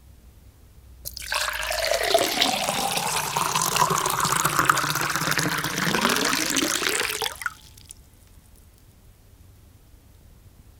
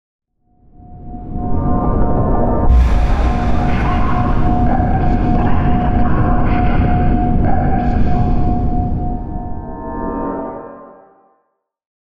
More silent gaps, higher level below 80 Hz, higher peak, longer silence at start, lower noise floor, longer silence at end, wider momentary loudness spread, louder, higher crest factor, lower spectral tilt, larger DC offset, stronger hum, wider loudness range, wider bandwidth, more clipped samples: neither; second, -50 dBFS vs -18 dBFS; about the same, -2 dBFS vs -2 dBFS; about the same, 0.25 s vs 0.2 s; second, -52 dBFS vs -67 dBFS; first, 0.3 s vs 0.15 s; second, 8 LU vs 11 LU; second, -23 LUFS vs -17 LUFS; first, 24 dB vs 12 dB; second, -2 dB/octave vs -9.5 dB/octave; second, under 0.1% vs 2%; neither; about the same, 8 LU vs 6 LU; first, 18 kHz vs 6.2 kHz; neither